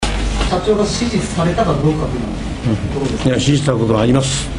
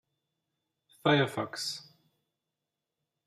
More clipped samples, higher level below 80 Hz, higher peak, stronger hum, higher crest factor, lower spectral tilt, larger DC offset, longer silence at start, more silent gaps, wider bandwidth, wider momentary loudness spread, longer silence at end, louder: neither; first, -26 dBFS vs -78 dBFS; first, 0 dBFS vs -12 dBFS; neither; second, 16 dB vs 24 dB; about the same, -5.5 dB/octave vs -5 dB/octave; neither; second, 0 s vs 1.05 s; neither; second, 11 kHz vs 14.5 kHz; second, 6 LU vs 10 LU; second, 0 s vs 1.45 s; first, -16 LUFS vs -30 LUFS